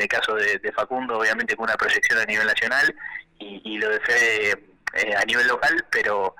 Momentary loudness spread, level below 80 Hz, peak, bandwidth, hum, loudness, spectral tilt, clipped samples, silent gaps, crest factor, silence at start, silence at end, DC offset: 10 LU; -58 dBFS; -14 dBFS; 17.5 kHz; none; -21 LUFS; -1.5 dB/octave; under 0.1%; none; 10 dB; 0 s; 0.1 s; under 0.1%